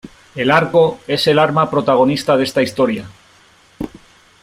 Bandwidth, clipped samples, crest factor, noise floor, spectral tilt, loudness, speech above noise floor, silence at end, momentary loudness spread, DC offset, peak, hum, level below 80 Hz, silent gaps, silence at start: 16 kHz; under 0.1%; 16 dB; -49 dBFS; -5.5 dB/octave; -15 LUFS; 35 dB; 0.55 s; 17 LU; under 0.1%; 0 dBFS; none; -50 dBFS; none; 0.05 s